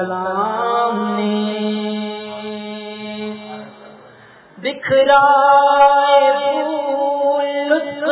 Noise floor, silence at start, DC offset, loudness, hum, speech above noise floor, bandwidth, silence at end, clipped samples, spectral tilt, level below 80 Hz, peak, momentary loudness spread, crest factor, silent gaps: -44 dBFS; 0 s; under 0.1%; -15 LUFS; none; 32 dB; 4 kHz; 0 s; under 0.1%; -8.5 dB/octave; -62 dBFS; 0 dBFS; 17 LU; 16 dB; none